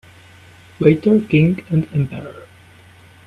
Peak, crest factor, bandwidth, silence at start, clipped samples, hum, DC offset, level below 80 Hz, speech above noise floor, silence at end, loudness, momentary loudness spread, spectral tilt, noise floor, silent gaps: 0 dBFS; 18 dB; 5.2 kHz; 0.8 s; under 0.1%; none; under 0.1%; -50 dBFS; 30 dB; 0.85 s; -16 LUFS; 14 LU; -9 dB/octave; -45 dBFS; none